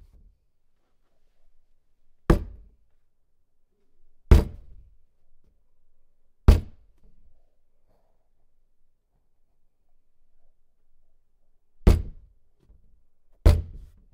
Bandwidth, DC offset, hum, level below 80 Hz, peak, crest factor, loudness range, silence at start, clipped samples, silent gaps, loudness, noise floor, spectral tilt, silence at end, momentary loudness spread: 15.5 kHz; under 0.1%; none; -30 dBFS; 0 dBFS; 28 dB; 7 LU; 2.3 s; under 0.1%; none; -24 LUFS; -64 dBFS; -7.5 dB/octave; 0.5 s; 18 LU